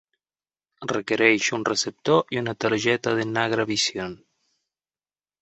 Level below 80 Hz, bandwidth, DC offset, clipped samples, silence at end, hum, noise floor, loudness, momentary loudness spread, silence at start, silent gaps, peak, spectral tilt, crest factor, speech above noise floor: -64 dBFS; 8.2 kHz; under 0.1%; under 0.1%; 1.25 s; none; under -90 dBFS; -23 LUFS; 10 LU; 0.8 s; none; -2 dBFS; -3.5 dB/octave; 22 dB; over 67 dB